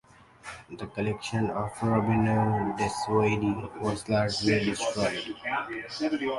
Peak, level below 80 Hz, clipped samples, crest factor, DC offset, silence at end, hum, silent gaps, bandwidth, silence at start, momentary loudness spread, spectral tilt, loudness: -10 dBFS; -52 dBFS; under 0.1%; 18 dB; under 0.1%; 0 s; none; none; 11.5 kHz; 0.45 s; 11 LU; -5.5 dB/octave; -28 LUFS